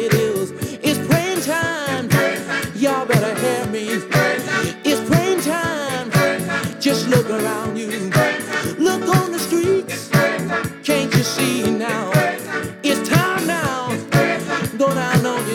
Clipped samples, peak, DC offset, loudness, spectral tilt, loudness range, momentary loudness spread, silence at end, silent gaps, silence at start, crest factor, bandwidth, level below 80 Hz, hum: under 0.1%; -2 dBFS; under 0.1%; -19 LUFS; -5 dB/octave; 1 LU; 6 LU; 0 s; none; 0 s; 16 dB; 18 kHz; -50 dBFS; none